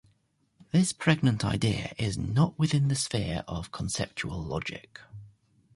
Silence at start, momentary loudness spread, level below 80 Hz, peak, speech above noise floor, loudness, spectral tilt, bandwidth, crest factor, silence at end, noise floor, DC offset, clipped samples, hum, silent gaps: 0.75 s; 12 LU; -48 dBFS; -10 dBFS; 42 dB; -29 LUFS; -5 dB/octave; 11.5 kHz; 18 dB; 0.45 s; -70 dBFS; under 0.1%; under 0.1%; none; none